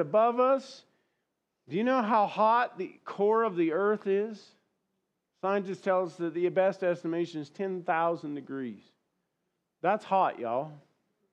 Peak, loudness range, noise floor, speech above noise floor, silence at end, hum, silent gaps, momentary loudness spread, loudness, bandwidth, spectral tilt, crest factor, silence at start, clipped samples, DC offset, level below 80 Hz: -14 dBFS; 5 LU; -82 dBFS; 53 dB; 0.55 s; none; none; 13 LU; -29 LUFS; 8.8 kHz; -7 dB/octave; 16 dB; 0 s; under 0.1%; under 0.1%; under -90 dBFS